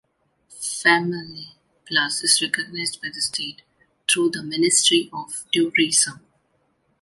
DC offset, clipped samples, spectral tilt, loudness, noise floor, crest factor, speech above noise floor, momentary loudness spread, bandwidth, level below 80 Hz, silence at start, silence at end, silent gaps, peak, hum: under 0.1%; under 0.1%; -1.5 dB/octave; -20 LUFS; -67 dBFS; 20 dB; 45 dB; 15 LU; 11.5 kHz; -68 dBFS; 0.5 s; 0.85 s; none; -4 dBFS; none